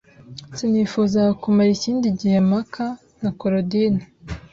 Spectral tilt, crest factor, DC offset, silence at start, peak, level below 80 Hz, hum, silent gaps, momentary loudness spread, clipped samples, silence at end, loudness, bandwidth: -7 dB/octave; 12 dB; under 0.1%; 0.3 s; -8 dBFS; -48 dBFS; none; none; 17 LU; under 0.1%; 0.15 s; -20 LUFS; 7.6 kHz